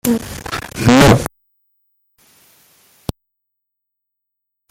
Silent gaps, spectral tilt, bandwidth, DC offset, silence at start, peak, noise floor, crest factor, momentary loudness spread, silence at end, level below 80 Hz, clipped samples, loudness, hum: none; -5.5 dB/octave; 17.5 kHz; under 0.1%; 0.05 s; 0 dBFS; -78 dBFS; 18 dB; 21 LU; 3.45 s; -36 dBFS; under 0.1%; -13 LUFS; 50 Hz at -45 dBFS